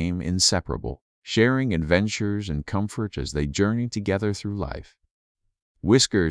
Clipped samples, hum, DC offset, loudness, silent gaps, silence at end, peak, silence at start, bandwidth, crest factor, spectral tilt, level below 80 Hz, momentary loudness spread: under 0.1%; none; under 0.1%; -24 LUFS; 1.01-1.22 s, 5.11-5.35 s, 5.62-5.75 s; 0 s; -4 dBFS; 0 s; 11 kHz; 20 dB; -4.5 dB/octave; -42 dBFS; 12 LU